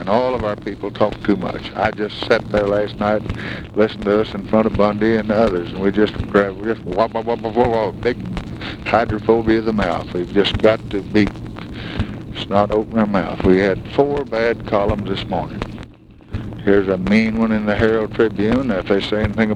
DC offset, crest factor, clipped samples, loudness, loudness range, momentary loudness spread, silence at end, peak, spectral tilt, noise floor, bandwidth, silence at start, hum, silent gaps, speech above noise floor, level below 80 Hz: under 0.1%; 18 dB; under 0.1%; -18 LUFS; 2 LU; 10 LU; 0 s; 0 dBFS; -7.5 dB/octave; -41 dBFS; 9.4 kHz; 0 s; none; none; 23 dB; -36 dBFS